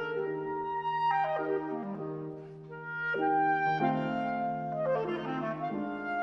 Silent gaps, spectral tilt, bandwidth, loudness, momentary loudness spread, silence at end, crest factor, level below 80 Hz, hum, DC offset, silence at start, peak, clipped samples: none; -8 dB/octave; 6.6 kHz; -32 LUFS; 11 LU; 0 s; 16 dB; -68 dBFS; none; under 0.1%; 0 s; -16 dBFS; under 0.1%